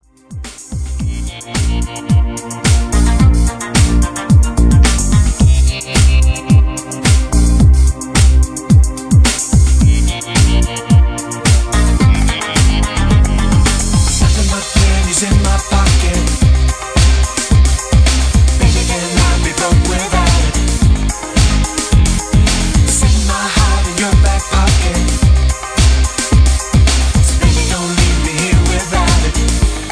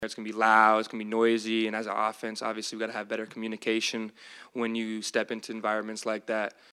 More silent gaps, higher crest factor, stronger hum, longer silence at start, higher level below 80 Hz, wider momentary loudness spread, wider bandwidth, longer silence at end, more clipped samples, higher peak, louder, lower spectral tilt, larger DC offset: neither; second, 10 dB vs 24 dB; neither; first, 0.3 s vs 0 s; first, -14 dBFS vs -80 dBFS; second, 5 LU vs 12 LU; second, 11 kHz vs 13.5 kHz; second, 0 s vs 0.2 s; neither; first, 0 dBFS vs -6 dBFS; first, -12 LUFS vs -29 LUFS; first, -4.5 dB/octave vs -3 dB/octave; neither